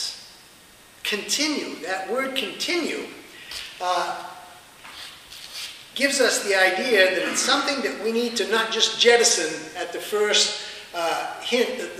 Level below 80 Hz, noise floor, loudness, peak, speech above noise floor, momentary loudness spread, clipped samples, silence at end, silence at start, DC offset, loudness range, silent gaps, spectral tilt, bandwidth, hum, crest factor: -66 dBFS; -50 dBFS; -22 LUFS; -4 dBFS; 27 dB; 18 LU; under 0.1%; 0 s; 0 s; under 0.1%; 9 LU; none; -0.5 dB/octave; 15.5 kHz; none; 22 dB